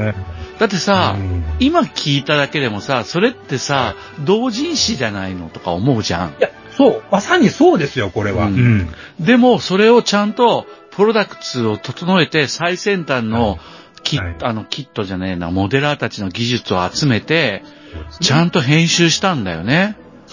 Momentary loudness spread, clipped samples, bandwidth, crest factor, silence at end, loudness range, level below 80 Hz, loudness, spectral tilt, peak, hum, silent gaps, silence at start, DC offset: 10 LU; under 0.1%; 7.4 kHz; 16 dB; 0.15 s; 5 LU; -36 dBFS; -16 LUFS; -5 dB/octave; 0 dBFS; none; none; 0 s; under 0.1%